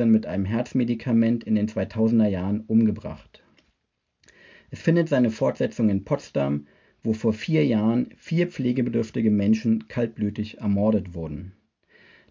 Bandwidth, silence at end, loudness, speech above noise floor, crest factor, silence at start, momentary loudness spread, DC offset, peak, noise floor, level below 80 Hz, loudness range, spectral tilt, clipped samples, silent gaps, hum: 7.4 kHz; 0.8 s; -24 LUFS; 54 dB; 18 dB; 0 s; 10 LU; under 0.1%; -6 dBFS; -77 dBFS; -50 dBFS; 2 LU; -8.5 dB/octave; under 0.1%; none; none